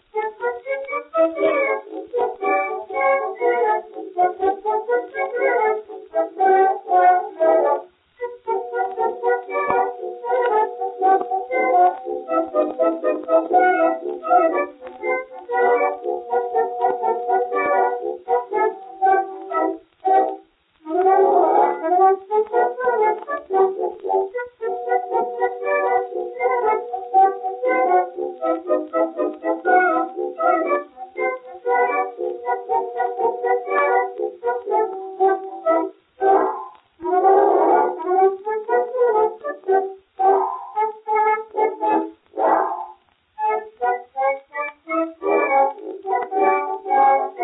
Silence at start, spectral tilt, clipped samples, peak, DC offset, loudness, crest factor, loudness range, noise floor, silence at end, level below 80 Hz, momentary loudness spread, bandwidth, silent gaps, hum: 0.15 s; -9 dB/octave; under 0.1%; -4 dBFS; under 0.1%; -20 LUFS; 16 dB; 4 LU; -49 dBFS; 0 s; -70 dBFS; 10 LU; 4 kHz; none; none